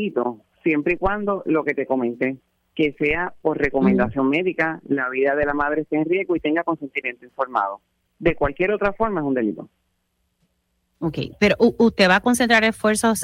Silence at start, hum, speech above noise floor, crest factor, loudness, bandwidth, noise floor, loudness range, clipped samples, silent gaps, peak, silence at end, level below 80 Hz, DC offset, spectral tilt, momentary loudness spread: 0 s; none; 50 dB; 18 dB; -21 LUFS; 16 kHz; -71 dBFS; 5 LU; under 0.1%; none; -4 dBFS; 0 s; -44 dBFS; under 0.1%; -5 dB/octave; 11 LU